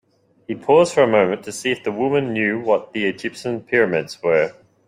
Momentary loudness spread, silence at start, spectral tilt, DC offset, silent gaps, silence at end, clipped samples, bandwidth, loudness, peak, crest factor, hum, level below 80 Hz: 10 LU; 0.5 s; -5 dB/octave; under 0.1%; none; 0.35 s; under 0.1%; 13.5 kHz; -19 LUFS; -2 dBFS; 18 dB; none; -62 dBFS